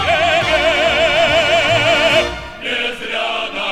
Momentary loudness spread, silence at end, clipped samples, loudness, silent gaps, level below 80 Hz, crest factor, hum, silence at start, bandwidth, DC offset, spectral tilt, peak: 8 LU; 0 s; under 0.1%; -14 LUFS; none; -38 dBFS; 14 dB; none; 0 s; 14.5 kHz; under 0.1%; -3 dB/octave; -2 dBFS